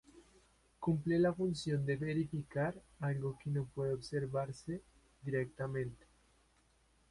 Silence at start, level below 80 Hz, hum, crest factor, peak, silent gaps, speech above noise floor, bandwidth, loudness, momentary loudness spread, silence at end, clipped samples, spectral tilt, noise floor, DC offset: 0.15 s; -64 dBFS; none; 16 dB; -22 dBFS; none; 35 dB; 11.5 kHz; -38 LUFS; 9 LU; 1.15 s; under 0.1%; -7.5 dB/octave; -72 dBFS; under 0.1%